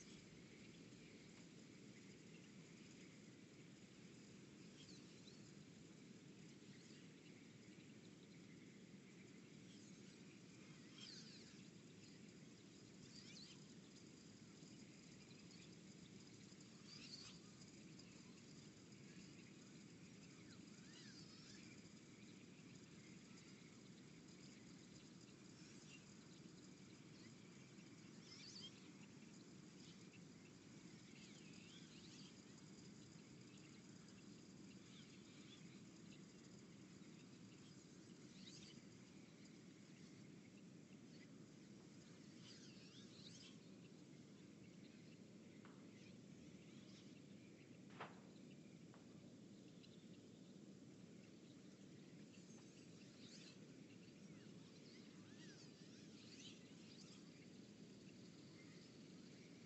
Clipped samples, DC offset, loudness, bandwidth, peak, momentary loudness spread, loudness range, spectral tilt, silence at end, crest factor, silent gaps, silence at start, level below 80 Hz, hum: under 0.1%; under 0.1%; -62 LUFS; 8.2 kHz; -42 dBFS; 4 LU; 2 LU; -4 dB/octave; 0 s; 20 dB; none; 0 s; -88 dBFS; none